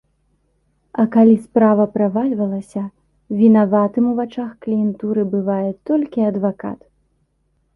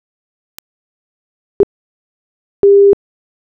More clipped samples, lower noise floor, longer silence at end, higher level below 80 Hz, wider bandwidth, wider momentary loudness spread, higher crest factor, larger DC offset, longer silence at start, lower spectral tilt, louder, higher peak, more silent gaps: neither; second, -65 dBFS vs under -90 dBFS; first, 1 s vs 0.5 s; second, -60 dBFS vs -50 dBFS; first, 3.4 kHz vs 1.8 kHz; first, 15 LU vs 10 LU; about the same, 16 dB vs 14 dB; neither; second, 0.95 s vs 1.6 s; about the same, -10 dB/octave vs -9 dB/octave; second, -17 LUFS vs -12 LUFS; about the same, -2 dBFS vs -2 dBFS; second, none vs 1.63-2.63 s